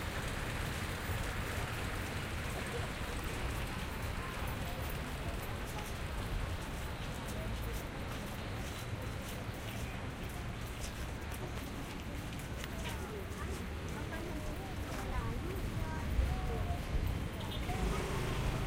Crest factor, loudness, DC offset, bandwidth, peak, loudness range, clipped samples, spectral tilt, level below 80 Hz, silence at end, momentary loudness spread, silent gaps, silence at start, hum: 18 dB; -40 LUFS; under 0.1%; 16 kHz; -20 dBFS; 4 LU; under 0.1%; -5 dB/octave; -42 dBFS; 0 s; 5 LU; none; 0 s; none